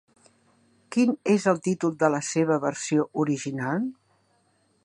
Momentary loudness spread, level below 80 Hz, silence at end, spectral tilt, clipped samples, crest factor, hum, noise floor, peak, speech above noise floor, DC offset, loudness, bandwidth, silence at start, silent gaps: 6 LU; -74 dBFS; 0.9 s; -5.5 dB/octave; under 0.1%; 20 dB; none; -67 dBFS; -6 dBFS; 43 dB; under 0.1%; -25 LUFS; 11 kHz; 0.9 s; none